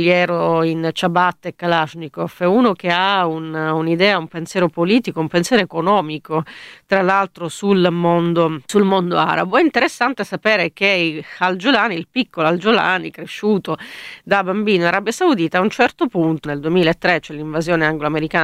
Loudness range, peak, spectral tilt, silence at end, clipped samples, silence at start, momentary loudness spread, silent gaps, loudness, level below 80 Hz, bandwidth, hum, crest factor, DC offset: 2 LU; 0 dBFS; -5.5 dB/octave; 0 s; under 0.1%; 0 s; 8 LU; none; -17 LUFS; -54 dBFS; 14.5 kHz; none; 16 dB; under 0.1%